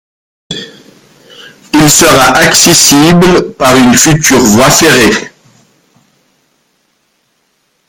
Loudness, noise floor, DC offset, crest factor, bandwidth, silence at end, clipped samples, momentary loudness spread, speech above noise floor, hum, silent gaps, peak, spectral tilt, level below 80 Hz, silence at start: -4 LUFS; -57 dBFS; under 0.1%; 8 dB; over 20 kHz; 2.6 s; 1%; 11 LU; 52 dB; none; none; 0 dBFS; -3 dB/octave; -34 dBFS; 0.5 s